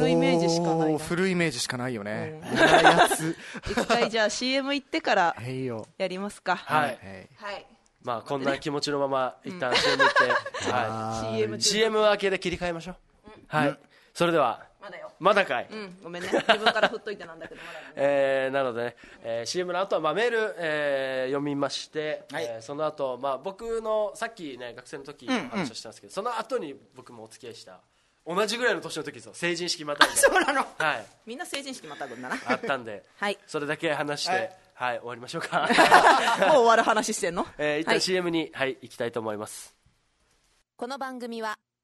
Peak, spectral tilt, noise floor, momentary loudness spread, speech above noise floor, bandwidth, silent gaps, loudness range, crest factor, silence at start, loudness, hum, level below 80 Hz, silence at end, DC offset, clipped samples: -2 dBFS; -3.5 dB/octave; -68 dBFS; 18 LU; 42 dB; 12 kHz; none; 10 LU; 26 dB; 0 s; -26 LUFS; none; -60 dBFS; 0.3 s; under 0.1%; under 0.1%